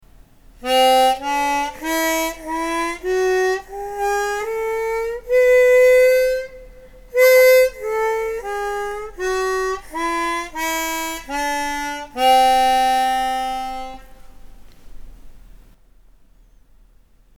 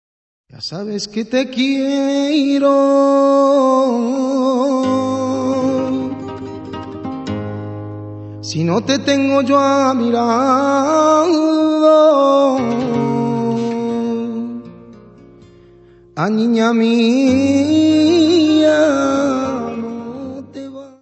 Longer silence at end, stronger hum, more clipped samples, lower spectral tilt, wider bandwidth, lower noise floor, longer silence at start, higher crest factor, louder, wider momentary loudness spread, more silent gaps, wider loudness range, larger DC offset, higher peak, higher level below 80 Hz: first, 2 s vs 0.15 s; neither; neither; second, -1.5 dB/octave vs -5.5 dB/octave; first, 18 kHz vs 8.4 kHz; first, -51 dBFS vs -45 dBFS; about the same, 0.6 s vs 0.55 s; about the same, 16 dB vs 14 dB; second, -18 LUFS vs -15 LUFS; second, 13 LU vs 16 LU; neither; about the same, 8 LU vs 8 LU; first, 0.2% vs under 0.1%; second, -4 dBFS vs 0 dBFS; first, -44 dBFS vs -58 dBFS